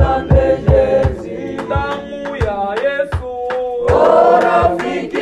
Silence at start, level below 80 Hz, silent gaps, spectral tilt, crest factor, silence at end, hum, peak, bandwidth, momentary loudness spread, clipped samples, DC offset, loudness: 0 s; -26 dBFS; none; -7.5 dB/octave; 14 dB; 0 s; none; 0 dBFS; 10.5 kHz; 12 LU; under 0.1%; under 0.1%; -15 LUFS